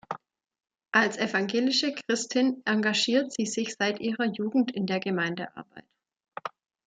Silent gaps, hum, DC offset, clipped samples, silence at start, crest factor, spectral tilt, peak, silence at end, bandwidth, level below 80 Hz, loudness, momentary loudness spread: none; none; under 0.1%; under 0.1%; 0.1 s; 22 dB; -3.5 dB/octave; -8 dBFS; 0.4 s; 9.4 kHz; -76 dBFS; -27 LUFS; 15 LU